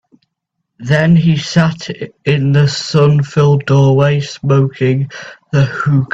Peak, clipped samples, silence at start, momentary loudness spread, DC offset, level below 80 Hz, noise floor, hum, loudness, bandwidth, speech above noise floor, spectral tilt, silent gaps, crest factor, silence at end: 0 dBFS; under 0.1%; 0.8 s; 10 LU; under 0.1%; -46 dBFS; -73 dBFS; none; -13 LUFS; 7.8 kHz; 61 dB; -7 dB/octave; none; 12 dB; 0.05 s